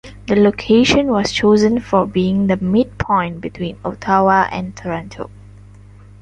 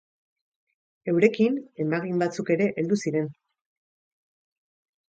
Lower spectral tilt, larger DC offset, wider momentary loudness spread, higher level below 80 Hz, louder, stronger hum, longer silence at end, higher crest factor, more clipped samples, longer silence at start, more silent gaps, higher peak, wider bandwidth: about the same, -6 dB/octave vs -7 dB/octave; neither; first, 13 LU vs 8 LU; first, -40 dBFS vs -74 dBFS; first, -16 LUFS vs -25 LUFS; first, 50 Hz at -35 dBFS vs none; second, 0.95 s vs 1.8 s; second, 14 dB vs 22 dB; neither; second, 0.05 s vs 1.05 s; neither; about the same, -2 dBFS vs -4 dBFS; about the same, 9.2 kHz vs 9 kHz